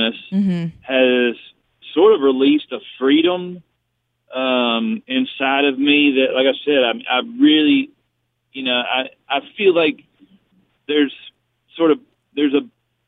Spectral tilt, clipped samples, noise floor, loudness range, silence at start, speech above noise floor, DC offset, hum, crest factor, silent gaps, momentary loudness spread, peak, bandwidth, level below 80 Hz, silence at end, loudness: -8 dB/octave; under 0.1%; -71 dBFS; 4 LU; 0 s; 55 dB; under 0.1%; none; 16 dB; none; 11 LU; -2 dBFS; 4 kHz; -68 dBFS; 0.4 s; -17 LUFS